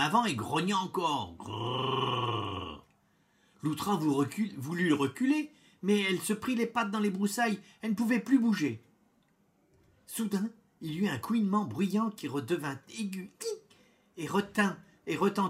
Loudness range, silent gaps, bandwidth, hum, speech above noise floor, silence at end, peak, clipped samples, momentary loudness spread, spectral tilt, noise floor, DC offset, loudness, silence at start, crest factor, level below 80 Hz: 4 LU; none; 16 kHz; none; 39 dB; 0 s; -14 dBFS; under 0.1%; 11 LU; -5 dB/octave; -70 dBFS; under 0.1%; -32 LUFS; 0 s; 18 dB; -70 dBFS